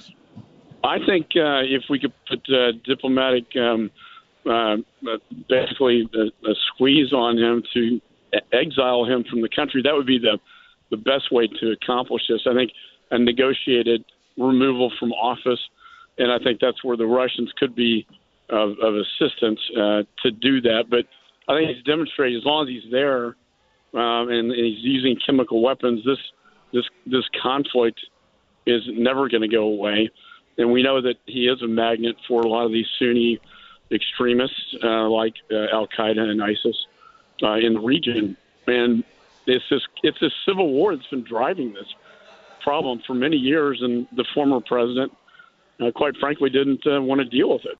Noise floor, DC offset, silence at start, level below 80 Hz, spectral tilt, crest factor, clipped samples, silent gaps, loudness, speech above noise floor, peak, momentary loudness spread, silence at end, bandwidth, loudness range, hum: -63 dBFS; under 0.1%; 0.35 s; -62 dBFS; -7.5 dB/octave; 18 dB; under 0.1%; none; -21 LUFS; 42 dB; -4 dBFS; 8 LU; 0.05 s; 4.6 kHz; 3 LU; none